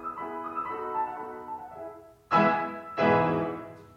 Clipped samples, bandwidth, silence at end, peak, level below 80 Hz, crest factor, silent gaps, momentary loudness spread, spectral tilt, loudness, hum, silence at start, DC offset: under 0.1%; 13.5 kHz; 0.1 s; -8 dBFS; -66 dBFS; 20 dB; none; 17 LU; -7.5 dB/octave; -28 LUFS; none; 0 s; under 0.1%